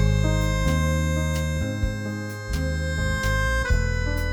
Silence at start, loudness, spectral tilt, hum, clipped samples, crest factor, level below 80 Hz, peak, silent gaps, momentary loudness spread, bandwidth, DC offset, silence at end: 0 s; -25 LUFS; -5.5 dB/octave; none; under 0.1%; 14 dB; -26 dBFS; -10 dBFS; none; 6 LU; 20 kHz; under 0.1%; 0 s